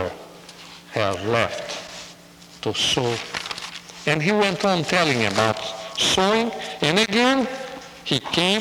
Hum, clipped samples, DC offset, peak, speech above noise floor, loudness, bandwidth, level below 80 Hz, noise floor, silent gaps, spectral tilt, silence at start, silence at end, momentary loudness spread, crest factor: none; under 0.1%; under 0.1%; -4 dBFS; 25 dB; -21 LUFS; over 20 kHz; -56 dBFS; -46 dBFS; none; -3.5 dB/octave; 0 s; 0 s; 17 LU; 18 dB